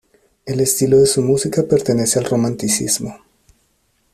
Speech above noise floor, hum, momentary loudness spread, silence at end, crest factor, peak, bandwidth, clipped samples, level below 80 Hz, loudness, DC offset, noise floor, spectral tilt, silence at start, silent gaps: 47 dB; none; 8 LU; 1 s; 14 dB; -2 dBFS; 14.5 kHz; under 0.1%; -50 dBFS; -16 LUFS; under 0.1%; -62 dBFS; -4.5 dB/octave; 0.45 s; none